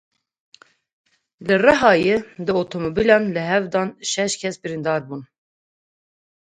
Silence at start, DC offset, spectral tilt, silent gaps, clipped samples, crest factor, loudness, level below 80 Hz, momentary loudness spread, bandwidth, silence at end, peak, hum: 1.4 s; under 0.1%; -4.5 dB/octave; none; under 0.1%; 22 dB; -19 LUFS; -54 dBFS; 11 LU; 9.4 kHz; 1.25 s; 0 dBFS; none